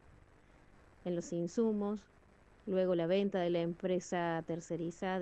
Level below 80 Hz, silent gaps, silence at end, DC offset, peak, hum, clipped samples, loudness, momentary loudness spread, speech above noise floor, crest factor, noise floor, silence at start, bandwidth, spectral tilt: -68 dBFS; none; 0 s; under 0.1%; -22 dBFS; none; under 0.1%; -36 LUFS; 8 LU; 27 dB; 16 dB; -63 dBFS; 1.05 s; 8.8 kHz; -6.5 dB/octave